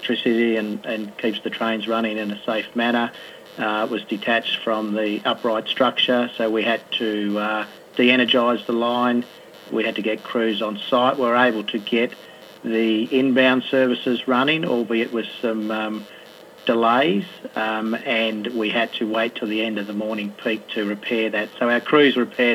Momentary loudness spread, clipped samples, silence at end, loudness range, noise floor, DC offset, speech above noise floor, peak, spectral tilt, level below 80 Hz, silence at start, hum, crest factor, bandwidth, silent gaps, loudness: 9 LU; under 0.1%; 0 s; 3 LU; -43 dBFS; under 0.1%; 22 dB; -2 dBFS; -5.5 dB/octave; -76 dBFS; 0 s; none; 20 dB; 14.5 kHz; none; -21 LUFS